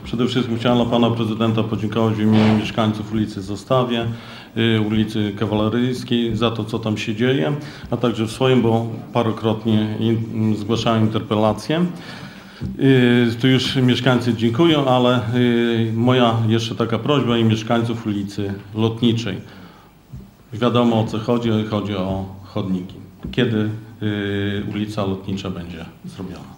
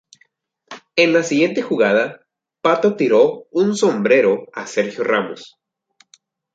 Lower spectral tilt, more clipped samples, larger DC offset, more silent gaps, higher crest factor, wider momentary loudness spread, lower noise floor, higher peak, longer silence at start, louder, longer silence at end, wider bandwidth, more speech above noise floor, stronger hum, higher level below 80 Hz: first, -7 dB/octave vs -5 dB/octave; neither; neither; neither; about the same, 20 dB vs 16 dB; first, 12 LU vs 9 LU; second, -44 dBFS vs -60 dBFS; about the same, 0 dBFS vs -2 dBFS; second, 0 s vs 0.7 s; about the same, -19 LUFS vs -17 LUFS; second, 0 s vs 1.1 s; first, 16.5 kHz vs 9.2 kHz; second, 26 dB vs 44 dB; neither; first, -48 dBFS vs -68 dBFS